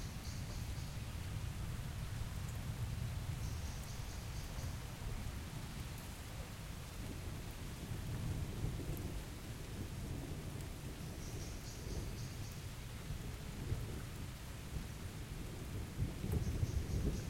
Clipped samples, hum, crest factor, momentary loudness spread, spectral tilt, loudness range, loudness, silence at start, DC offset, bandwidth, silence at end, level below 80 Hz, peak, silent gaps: under 0.1%; none; 18 dB; 7 LU; -5.5 dB/octave; 2 LU; -45 LUFS; 0 s; under 0.1%; 16.5 kHz; 0 s; -48 dBFS; -26 dBFS; none